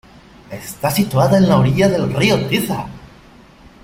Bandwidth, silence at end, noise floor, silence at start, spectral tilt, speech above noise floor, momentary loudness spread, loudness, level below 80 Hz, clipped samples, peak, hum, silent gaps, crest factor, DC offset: 16.5 kHz; 0.8 s; -44 dBFS; 0.5 s; -6 dB/octave; 29 dB; 18 LU; -15 LUFS; -42 dBFS; under 0.1%; -2 dBFS; none; none; 16 dB; under 0.1%